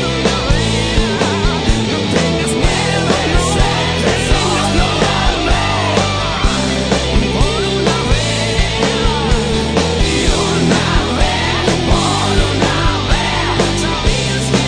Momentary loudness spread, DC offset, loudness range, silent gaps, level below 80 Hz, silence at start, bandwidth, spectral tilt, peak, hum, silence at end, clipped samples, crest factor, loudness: 2 LU; under 0.1%; 1 LU; none; -20 dBFS; 0 s; 10 kHz; -4.5 dB/octave; 0 dBFS; none; 0 s; under 0.1%; 14 dB; -14 LUFS